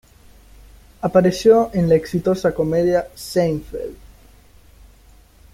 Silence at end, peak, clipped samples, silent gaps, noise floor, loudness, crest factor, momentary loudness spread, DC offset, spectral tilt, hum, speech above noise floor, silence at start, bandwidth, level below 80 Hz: 1.6 s; -2 dBFS; under 0.1%; none; -49 dBFS; -18 LUFS; 18 dB; 12 LU; under 0.1%; -7 dB/octave; none; 31 dB; 1.05 s; 16 kHz; -44 dBFS